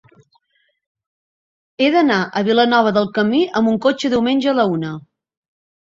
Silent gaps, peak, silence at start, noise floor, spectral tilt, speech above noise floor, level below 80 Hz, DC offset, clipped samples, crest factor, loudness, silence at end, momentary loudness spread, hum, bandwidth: none; -2 dBFS; 1.8 s; -64 dBFS; -6 dB/octave; 48 dB; -58 dBFS; under 0.1%; under 0.1%; 16 dB; -16 LUFS; 0.85 s; 5 LU; none; 7.6 kHz